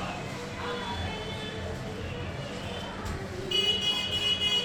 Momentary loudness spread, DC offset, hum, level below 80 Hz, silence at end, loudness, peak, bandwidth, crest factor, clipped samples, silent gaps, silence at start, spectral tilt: 12 LU; under 0.1%; none; -48 dBFS; 0 s; -30 LUFS; -16 dBFS; 19 kHz; 16 dB; under 0.1%; none; 0 s; -3.5 dB/octave